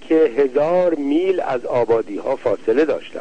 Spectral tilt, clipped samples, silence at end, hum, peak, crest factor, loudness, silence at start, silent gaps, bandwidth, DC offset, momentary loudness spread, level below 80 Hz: -7 dB/octave; under 0.1%; 0 s; none; -6 dBFS; 12 dB; -18 LUFS; 0 s; none; 9 kHz; 1%; 5 LU; -56 dBFS